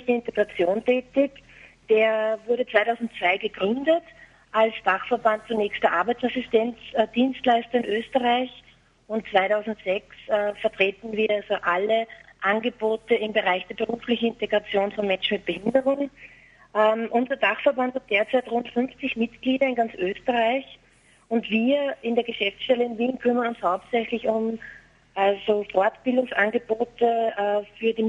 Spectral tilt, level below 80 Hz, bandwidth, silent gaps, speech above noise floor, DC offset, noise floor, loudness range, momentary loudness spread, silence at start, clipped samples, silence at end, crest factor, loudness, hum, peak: -6 dB/octave; -62 dBFS; 10 kHz; none; 34 dB; under 0.1%; -58 dBFS; 2 LU; 6 LU; 0 s; under 0.1%; 0 s; 20 dB; -24 LUFS; none; -4 dBFS